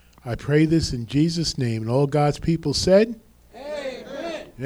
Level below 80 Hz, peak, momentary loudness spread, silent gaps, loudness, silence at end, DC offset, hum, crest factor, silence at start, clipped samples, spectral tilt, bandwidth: -42 dBFS; -6 dBFS; 15 LU; none; -22 LUFS; 0 s; under 0.1%; none; 18 dB; 0.25 s; under 0.1%; -6 dB/octave; 14 kHz